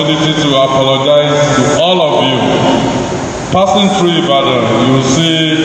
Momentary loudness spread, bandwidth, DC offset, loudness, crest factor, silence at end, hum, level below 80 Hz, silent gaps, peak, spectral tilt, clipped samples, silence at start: 3 LU; 10 kHz; under 0.1%; -10 LUFS; 10 dB; 0 s; none; -40 dBFS; none; 0 dBFS; -5 dB/octave; 0.3%; 0 s